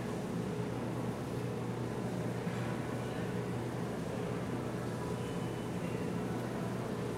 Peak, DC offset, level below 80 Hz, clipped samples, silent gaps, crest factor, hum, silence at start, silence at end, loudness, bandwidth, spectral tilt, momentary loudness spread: -26 dBFS; under 0.1%; -58 dBFS; under 0.1%; none; 12 dB; none; 0 s; 0 s; -38 LUFS; 16 kHz; -6.5 dB/octave; 1 LU